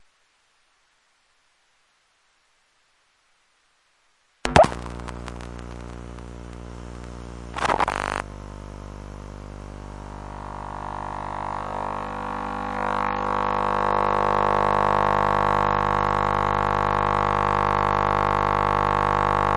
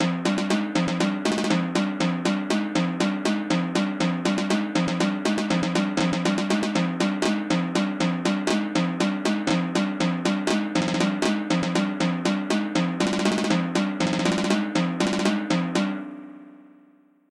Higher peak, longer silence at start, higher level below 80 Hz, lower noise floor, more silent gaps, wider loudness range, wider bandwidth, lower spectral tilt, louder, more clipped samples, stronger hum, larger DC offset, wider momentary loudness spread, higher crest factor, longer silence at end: first, 0 dBFS vs -10 dBFS; first, 4.45 s vs 0 s; first, -40 dBFS vs -58 dBFS; first, -65 dBFS vs -57 dBFS; neither; first, 12 LU vs 1 LU; about the same, 11.5 kHz vs 12 kHz; about the same, -5.5 dB/octave vs -5 dB/octave; about the same, -23 LUFS vs -24 LUFS; neither; neither; neither; first, 19 LU vs 2 LU; first, 24 dB vs 14 dB; second, 0 s vs 0.8 s